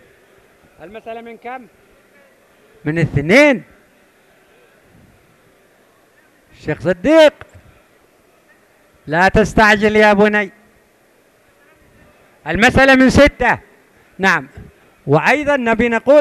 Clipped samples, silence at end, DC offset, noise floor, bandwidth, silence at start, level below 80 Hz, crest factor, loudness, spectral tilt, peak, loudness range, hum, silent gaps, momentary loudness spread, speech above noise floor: under 0.1%; 0 s; under 0.1%; -53 dBFS; 14 kHz; 0.8 s; -36 dBFS; 16 dB; -13 LUFS; -5.5 dB/octave; 0 dBFS; 5 LU; none; none; 21 LU; 41 dB